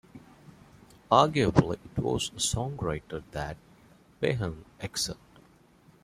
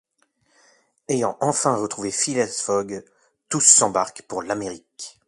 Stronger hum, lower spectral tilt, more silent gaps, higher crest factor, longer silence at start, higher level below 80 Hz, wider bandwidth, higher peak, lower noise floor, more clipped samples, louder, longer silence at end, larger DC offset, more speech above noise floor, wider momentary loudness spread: neither; first, -4.5 dB/octave vs -2.5 dB/octave; neither; about the same, 24 dB vs 24 dB; second, 0.15 s vs 1.1 s; first, -50 dBFS vs -64 dBFS; first, 14.5 kHz vs 12.5 kHz; second, -6 dBFS vs 0 dBFS; second, -59 dBFS vs -67 dBFS; neither; second, -29 LUFS vs -20 LUFS; first, 0.9 s vs 0.2 s; neither; second, 31 dB vs 44 dB; second, 15 LU vs 20 LU